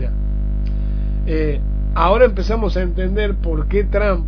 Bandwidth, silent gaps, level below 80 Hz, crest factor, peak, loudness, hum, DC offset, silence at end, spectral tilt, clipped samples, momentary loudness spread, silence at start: 5.4 kHz; none; -18 dBFS; 16 dB; -2 dBFS; -19 LUFS; 50 Hz at -20 dBFS; under 0.1%; 0 s; -8.5 dB/octave; under 0.1%; 9 LU; 0 s